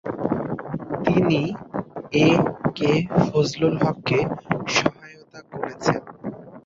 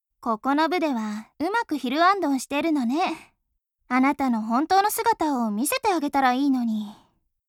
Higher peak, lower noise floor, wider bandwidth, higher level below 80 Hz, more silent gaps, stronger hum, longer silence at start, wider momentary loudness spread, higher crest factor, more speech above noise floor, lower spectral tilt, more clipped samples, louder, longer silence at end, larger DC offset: first, -2 dBFS vs -8 dBFS; second, -44 dBFS vs -76 dBFS; second, 7.6 kHz vs 17 kHz; first, -52 dBFS vs -62 dBFS; neither; neither; second, 0.05 s vs 0.2 s; first, 13 LU vs 9 LU; about the same, 20 dB vs 16 dB; second, 24 dB vs 53 dB; first, -6 dB/octave vs -3.5 dB/octave; neither; about the same, -22 LUFS vs -23 LUFS; second, 0.05 s vs 0.55 s; neither